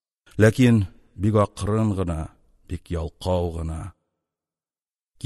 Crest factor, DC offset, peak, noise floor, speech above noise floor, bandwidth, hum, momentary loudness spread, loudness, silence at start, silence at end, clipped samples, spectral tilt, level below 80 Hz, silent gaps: 22 dB; under 0.1%; -2 dBFS; under -90 dBFS; over 69 dB; 12.5 kHz; none; 18 LU; -23 LUFS; 0.35 s; 1.35 s; under 0.1%; -7.5 dB/octave; -40 dBFS; none